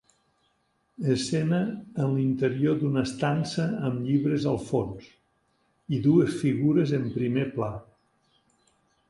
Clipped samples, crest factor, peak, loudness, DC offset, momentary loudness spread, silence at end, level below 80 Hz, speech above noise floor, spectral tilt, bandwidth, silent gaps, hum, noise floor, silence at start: under 0.1%; 18 dB; -8 dBFS; -26 LUFS; under 0.1%; 9 LU; 1.3 s; -58 dBFS; 46 dB; -7 dB/octave; 11.5 kHz; none; none; -71 dBFS; 1 s